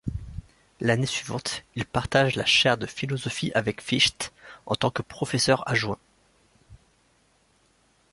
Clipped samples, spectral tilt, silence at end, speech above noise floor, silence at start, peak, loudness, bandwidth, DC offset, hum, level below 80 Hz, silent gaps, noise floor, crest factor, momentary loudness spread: under 0.1%; -4 dB/octave; 1.35 s; 39 dB; 0.05 s; -6 dBFS; -25 LUFS; 11.5 kHz; under 0.1%; none; -50 dBFS; none; -64 dBFS; 20 dB; 15 LU